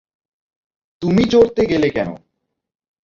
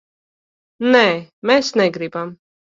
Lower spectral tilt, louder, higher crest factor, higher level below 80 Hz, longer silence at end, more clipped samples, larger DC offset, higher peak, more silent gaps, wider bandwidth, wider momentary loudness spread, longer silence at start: first, -7 dB/octave vs -4.5 dB/octave; about the same, -16 LUFS vs -17 LUFS; about the same, 18 dB vs 18 dB; first, -46 dBFS vs -64 dBFS; first, 0.9 s vs 0.4 s; neither; neither; about the same, -2 dBFS vs 0 dBFS; second, none vs 1.33-1.42 s; about the same, 7.4 kHz vs 7.6 kHz; about the same, 12 LU vs 13 LU; first, 1 s vs 0.8 s